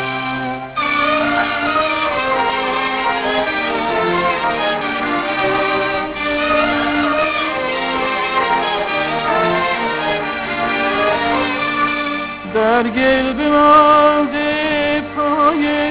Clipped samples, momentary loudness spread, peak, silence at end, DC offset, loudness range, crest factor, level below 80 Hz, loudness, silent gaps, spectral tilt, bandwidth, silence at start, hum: under 0.1%; 5 LU; 0 dBFS; 0 s; under 0.1%; 3 LU; 16 dB; -44 dBFS; -16 LUFS; none; -8 dB/octave; 4 kHz; 0 s; none